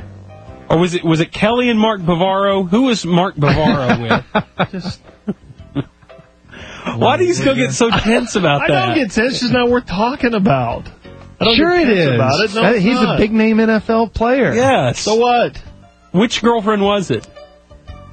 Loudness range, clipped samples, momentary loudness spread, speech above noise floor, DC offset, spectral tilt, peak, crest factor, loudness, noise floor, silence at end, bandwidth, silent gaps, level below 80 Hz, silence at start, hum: 5 LU; under 0.1%; 11 LU; 29 dB; under 0.1%; -5.5 dB/octave; 0 dBFS; 16 dB; -14 LUFS; -43 dBFS; 0.05 s; 9.2 kHz; none; -38 dBFS; 0 s; none